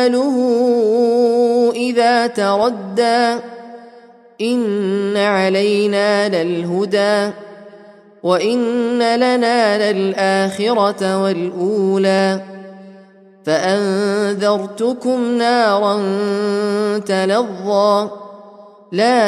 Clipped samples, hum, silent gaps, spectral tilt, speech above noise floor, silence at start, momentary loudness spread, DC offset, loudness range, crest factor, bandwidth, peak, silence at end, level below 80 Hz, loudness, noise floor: under 0.1%; none; none; -5 dB/octave; 29 dB; 0 s; 6 LU; under 0.1%; 3 LU; 14 dB; 12.5 kHz; -2 dBFS; 0 s; -68 dBFS; -16 LUFS; -44 dBFS